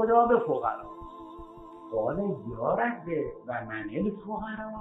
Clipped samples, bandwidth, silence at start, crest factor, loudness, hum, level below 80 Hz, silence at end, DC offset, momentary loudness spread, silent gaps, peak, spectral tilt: under 0.1%; 4 kHz; 0 s; 20 dB; -30 LUFS; none; -54 dBFS; 0 s; under 0.1%; 20 LU; none; -10 dBFS; -9.5 dB/octave